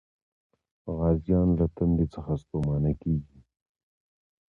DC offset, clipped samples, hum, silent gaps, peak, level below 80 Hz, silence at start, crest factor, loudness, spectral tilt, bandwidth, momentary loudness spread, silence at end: under 0.1%; under 0.1%; none; none; -12 dBFS; -40 dBFS; 0.85 s; 16 dB; -27 LUFS; -12 dB/octave; 4.3 kHz; 8 LU; 1.3 s